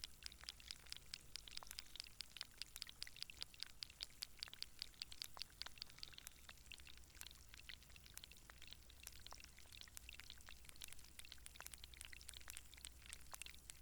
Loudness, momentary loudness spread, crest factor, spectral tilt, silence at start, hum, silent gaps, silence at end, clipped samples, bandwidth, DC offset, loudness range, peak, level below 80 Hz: -55 LUFS; 7 LU; 30 dB; -0.5 dB/octave; 0 s; none; none; 0 s; under 0.1%; 19.5 kHz; under 0.1%; 6 LU; -26 dBFS; -68 dBFS